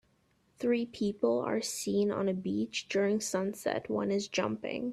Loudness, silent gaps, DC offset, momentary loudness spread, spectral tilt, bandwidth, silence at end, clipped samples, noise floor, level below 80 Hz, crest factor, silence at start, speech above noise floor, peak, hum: -32 LUFS; none; under 0.1%; 5 LU; -4.5 dB/octave; 14.5 kHz; 0 s; under 0.1%; -71 dBFS; -70 dBFS; 16 dB; 0.6 s; 39 dB; -16 dBFS; none